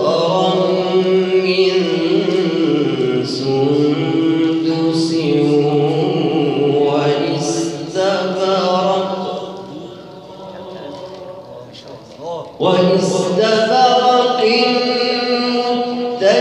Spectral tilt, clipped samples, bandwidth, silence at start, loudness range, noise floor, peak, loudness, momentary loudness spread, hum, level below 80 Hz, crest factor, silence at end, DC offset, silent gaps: -5.5 dB/octave; under 0.1%; 11.5 kHz; 0 s; 8 LU; -35 dBFS; 0 dBFS; -15 LUFS; 18 LU; none; -62 dBFS; 14 dB; 0 s; under 0.1%; none